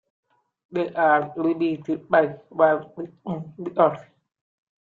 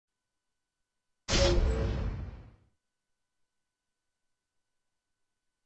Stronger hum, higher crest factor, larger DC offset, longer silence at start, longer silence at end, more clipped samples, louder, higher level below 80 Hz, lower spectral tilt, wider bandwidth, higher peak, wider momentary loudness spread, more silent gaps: neither; about the same, 20 dB vs 22 dB; neither; second, 0.7 s vs 1.3 s; second, 0.8 s vs 3.2 s; neither; first, -23 LUFS vs -30 LUFS; second, -70 dBFS vs -38 dBFS; first, -8.5 dB/octave vs -4.5 dB/octave; second, 4.5 kHz vs 8.4 kHz; first, -4 dBFS vs -14 dBFS; second, 13 LU vs 19 LU; neither